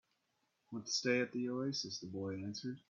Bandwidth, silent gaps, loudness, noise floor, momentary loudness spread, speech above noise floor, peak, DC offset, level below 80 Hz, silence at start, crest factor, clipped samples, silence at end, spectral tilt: 7.6 kHz; none; -39 LUFS; -82 dBFS; 9 LU; 42 dB; -22 dBFS; under 0.1%; -82 dBFS; 0.7 s; 18 dB; under 0.1%; 0.1 s; -4 dB/octave